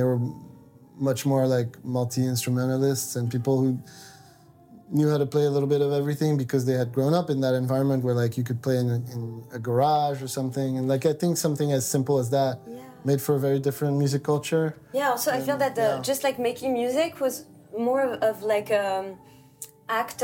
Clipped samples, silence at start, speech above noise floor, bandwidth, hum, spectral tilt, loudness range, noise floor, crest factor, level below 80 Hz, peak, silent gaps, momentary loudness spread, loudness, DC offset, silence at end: under 0.1%; 0 s; 28 dB; 17 kHz; none; -6 dB/octave; 2 LU; -53 dBFS; 14 dB; -68 dBFS; -12 dBFS; none; 7 LU; -25 LUFS; under 0.1%; 0 s